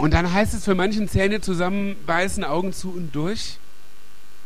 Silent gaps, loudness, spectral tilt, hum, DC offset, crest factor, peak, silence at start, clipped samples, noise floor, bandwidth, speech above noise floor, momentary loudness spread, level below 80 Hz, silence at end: none; -23 LUFS; -5.5 dB/octave; none; 5%; 22 dB; -2 dBFS; 0 s; under 0.1%; -52 dBFS; 15.5 kHz; 30 dB; 9 LU; -34 dBFS; 0.9 s